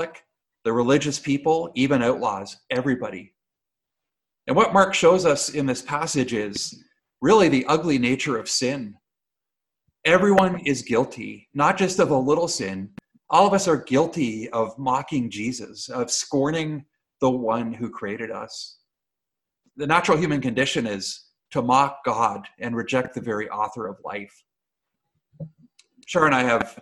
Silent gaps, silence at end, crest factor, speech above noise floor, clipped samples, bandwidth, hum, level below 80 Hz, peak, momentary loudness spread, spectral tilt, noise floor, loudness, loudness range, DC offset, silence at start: none; 0.1 s; 22 dB; 65 dB; under 0.1%; 12.5 kHz; none; -58 dBFS; -2 dBFS; 16 LU; -4.5 dB/octave; -87 dBFS; -22 LUFS; 6 LU; under 0.1%; 0 s